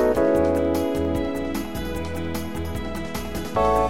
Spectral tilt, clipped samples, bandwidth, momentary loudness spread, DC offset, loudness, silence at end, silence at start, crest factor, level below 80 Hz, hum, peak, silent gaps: -6 dB/octave; under 0.1%; 17 kHz; 10 LU; 1%; -25 LUFS; 0 s; 0 s; 16 dB; -36 dBFS; none; -8 dBFS; none